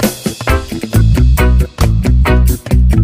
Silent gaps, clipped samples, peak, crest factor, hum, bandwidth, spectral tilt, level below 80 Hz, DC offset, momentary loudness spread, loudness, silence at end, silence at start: none; under 0.1%; 0 dBFS; 10 dB; none; 16 kHz; -6 dB/octave; -12 dBFS; 0.4%; 6 LU; -12 LUFS; 0 s; 0 s